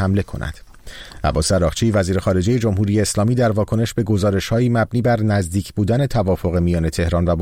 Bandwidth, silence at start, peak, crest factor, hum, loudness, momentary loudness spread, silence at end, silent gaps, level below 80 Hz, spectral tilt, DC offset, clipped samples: 16 kHz; 0 s; -6 dBFS; 12 dB; none; -18 LUFS; 5 LU; 0 s; none; -34 dBFS; -6 dB/octave; 0.2%; under 0.1%